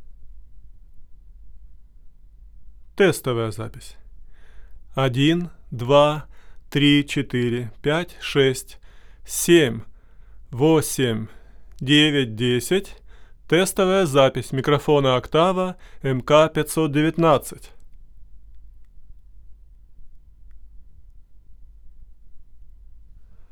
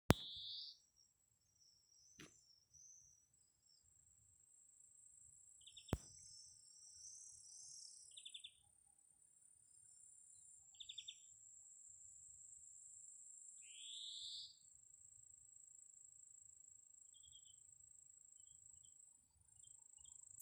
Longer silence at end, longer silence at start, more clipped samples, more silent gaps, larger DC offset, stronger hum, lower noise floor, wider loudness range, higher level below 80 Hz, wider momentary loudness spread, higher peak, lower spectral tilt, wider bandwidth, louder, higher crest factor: about the same, 0.05 s vs 0 s; about the same, 0 s vs 0.1 s; neither; neither; neither; neither; second, -44 dBFS vs -81 dBFS; second, 8 LU vs 11 LU; first, -46 dBFS vs -68 dBFS; about the same, 15 LU vs 17 LU; first, -2 dBFS vs -12 dBFS; about the same, -5 dB/octave vs -4 dB/octave; first, over 20 kHz vs 11 kHz; first, -20 LUFS vs -55 LUFS; second, 20 dB vs 44 dB